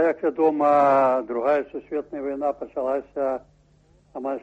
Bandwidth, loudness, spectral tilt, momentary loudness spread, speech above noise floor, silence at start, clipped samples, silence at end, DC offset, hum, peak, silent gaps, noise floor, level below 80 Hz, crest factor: 8 kHz; -23 LUFS; -7.5 dB/octave; 13 LU; 35 dB; 0 s; under 0.1%; 0.05 s; under 0.1%; none; -8 dBFS; none; -58 dBFS; -62 dBFS; 16 dB